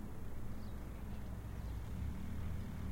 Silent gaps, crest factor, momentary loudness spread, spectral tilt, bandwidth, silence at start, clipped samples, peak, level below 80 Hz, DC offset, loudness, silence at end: none; 12 dB; 4 LU; -7 dB/octave; 16.5 kHz; 0 s; under 0.1%; -32 dBFS; -48 dBFS; under 0.1%; -47 LUFS; 0 s